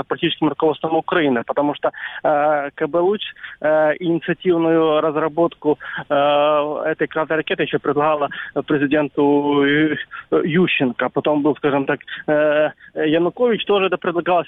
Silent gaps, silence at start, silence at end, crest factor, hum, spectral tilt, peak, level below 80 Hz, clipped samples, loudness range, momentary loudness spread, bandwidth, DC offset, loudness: none; 0 s; 0.05 s; 14 dB; none; -9 dB/octave; -4 dBFS; -60 dBFS; under 0.1%; 1 LU; 6 LU; 4 kHz; under 0.1%; -19 LUFS